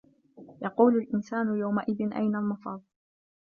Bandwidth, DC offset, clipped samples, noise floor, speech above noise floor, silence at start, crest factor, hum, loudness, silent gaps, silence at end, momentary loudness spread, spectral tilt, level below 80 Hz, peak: 6.8 kHz; under 0.1%; under 0.1%; -52 dBFS; 25 dB; 0.4 s; 20 dB; none; -28 LUFS; none; 0.6 s; 14 LU; -9 dB/octave; -72 dBFS; -8 dBFS